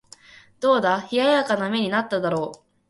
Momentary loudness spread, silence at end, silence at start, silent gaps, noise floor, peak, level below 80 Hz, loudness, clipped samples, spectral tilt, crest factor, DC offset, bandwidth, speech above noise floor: 6 LU; 0.35 s; 0.6 s; none; -49 dBFS; -6 dBFS; -66 dBFS; -22 LUFS; under 0.1%; -5 dB/octave; 16 dB; under 0.1%; 11.5 kHz; 28 dB